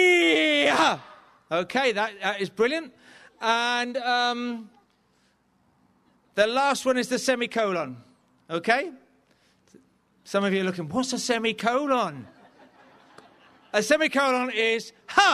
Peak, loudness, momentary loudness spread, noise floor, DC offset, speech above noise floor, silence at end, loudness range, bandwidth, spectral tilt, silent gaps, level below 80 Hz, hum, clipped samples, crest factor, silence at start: -6 dBFS; -24 LUFS; 11 LU; -66 dBFS; under 0.1%; 41 dB; 0 s; 3 LU; 13.5 kHz; -3 dB/octave; none; -68 dBFS; none; under 0.1%; 20 dB; 0 s